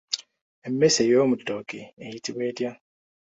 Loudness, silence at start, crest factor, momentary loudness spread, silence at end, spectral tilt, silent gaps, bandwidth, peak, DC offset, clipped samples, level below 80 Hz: -24 LUFS; 0.1 s; 20 dB; 19 LU; 0.5 s; -4 dB/octave; 0.41-0.62 s, 1.93-1.97 s; 8.4 kHz; -6 dBFS; under 0.1%; under 0.1%; -66 dBFS